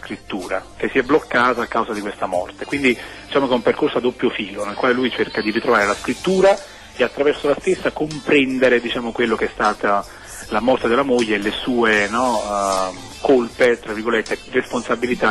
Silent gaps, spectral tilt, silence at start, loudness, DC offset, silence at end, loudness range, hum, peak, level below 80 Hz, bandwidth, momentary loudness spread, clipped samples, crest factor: none; -4.5 dB/octave; 0 s; -19 LUFS; under 0.1%; 0 s; 2 LU; none; -4 dBFS; -46 dBFS; 12.5 kHz; 9 LU; under 0.1%; 14 dB